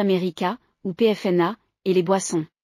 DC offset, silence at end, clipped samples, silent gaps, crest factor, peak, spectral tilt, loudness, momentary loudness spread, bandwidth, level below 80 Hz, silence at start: under 0.1%; 0.2 s; under 0.1%; none; 16 dB; -6 dBFS; -5.5 dB/octave; -23 LUFS; 9 LU; 14 kHz; -70 dBFS; 0 s